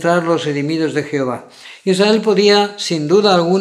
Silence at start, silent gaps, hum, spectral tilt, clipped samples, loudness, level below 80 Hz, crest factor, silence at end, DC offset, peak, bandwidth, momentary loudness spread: 0 s; none; none; -5 dB/octave; under 0.1%; -15 LUFS; -72 dBFS; 14 dB; 0 s; under 0.1%; 0 dBFS; 13 kHz; 9 LU